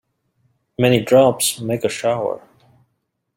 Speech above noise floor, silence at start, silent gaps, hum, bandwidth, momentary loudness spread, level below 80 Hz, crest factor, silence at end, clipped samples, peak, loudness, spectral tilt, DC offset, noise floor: 55 dB; 0.8 s; none; none; 16.5 kHz; 13 LU; -58 dBFS; 18 dB; 1 s; under 0.1%; -2 dBFS; -17 LUFS; -4.5 dB/octave; under 0.1%; -72 dBFS